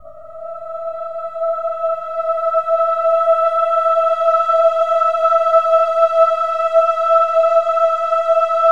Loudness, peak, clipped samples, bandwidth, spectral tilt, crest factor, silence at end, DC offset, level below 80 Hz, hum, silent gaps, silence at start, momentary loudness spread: -15 LUFS; -2 dBFS; under 0.1%; 7.6 kHz; -2 dB/octave; 14 dB; 0 s; 1%; -66 dBFS; none; none; 0.05 s; 12 LU